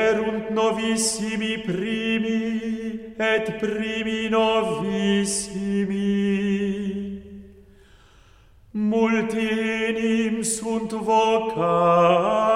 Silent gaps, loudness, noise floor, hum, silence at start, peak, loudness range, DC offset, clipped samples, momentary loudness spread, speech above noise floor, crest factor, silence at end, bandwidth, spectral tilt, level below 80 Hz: none; -23 LUFS; -52 dBFS; none; 0 s; -6 dBFS; 5 LU; under 0.1%; under 0.1%; 8 LU; 30 dB; 16 dB; 0 s; 14 kHz; -4.5 dB/octave; -54 dBFS